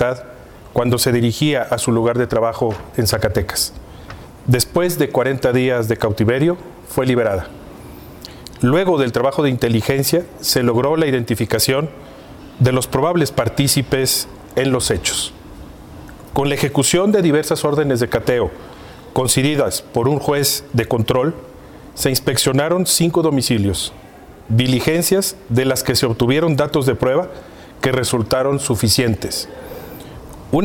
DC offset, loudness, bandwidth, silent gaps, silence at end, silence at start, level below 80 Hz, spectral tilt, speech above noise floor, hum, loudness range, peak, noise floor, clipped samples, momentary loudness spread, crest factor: under 0.1%; -17 LUFS; 17.5 kHz; none; 0 s; 0 s; -40 dBFS; -4.5 dB/octave; 21 dB; none; 2 LU; -2 dBFS; -38 dBFS; under 0.1%; 19 LU; 16 dB